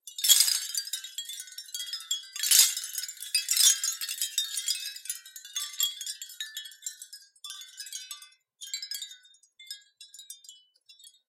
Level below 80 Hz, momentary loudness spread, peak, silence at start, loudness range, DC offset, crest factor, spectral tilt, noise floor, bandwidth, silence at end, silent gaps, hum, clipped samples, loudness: under -90 dBFS; 24 LU; -2 dBFS; 0.05 s; 16 LU; under 0.1%; 28 dB; 10 dB/octave; -58 dBFS; 17 kHz; 0.2 s; none; none; under 0.1%; -26 LUFS